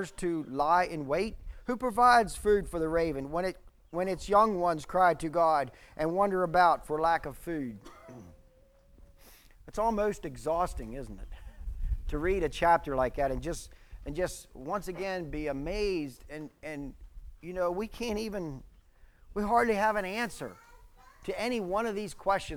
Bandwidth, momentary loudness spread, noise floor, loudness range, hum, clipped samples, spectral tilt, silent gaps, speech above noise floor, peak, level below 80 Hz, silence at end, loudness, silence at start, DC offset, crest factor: 19.5 kHz; 18 LU; -61 dBFS; 8 LU; none; under 0.1%; -5.5 dB/octave; none; 31 dB; -10 dBFS; -46 dBFS; 0 s; -30 LUFS; 0 s; under 0.1%; 22 dB